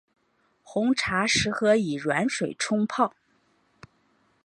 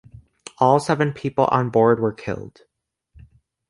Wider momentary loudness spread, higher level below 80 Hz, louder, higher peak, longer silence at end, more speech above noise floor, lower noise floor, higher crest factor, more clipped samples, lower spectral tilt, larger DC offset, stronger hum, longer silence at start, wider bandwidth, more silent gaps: second, 5 LU vs 13 LU; about the same, -56 dBFS vs -54 dBFS; second, -25 LUFS vs -20 LUFS; second, -8 dBFS vs -2 dBFS; first, 1.35 s vs 1.2 s; about the same, 44 dB vs 47 dB; about the same, -69 dBFS vs -66 dBFS; about the same, 20 dB vs 20 dB; neither; second, -4 dB/octave vs -7 dB/octave; neither; neither; about the same, 0.7 s vs 0.6 s; about the same, 11.5 kHz vs 11.5 kHz; neither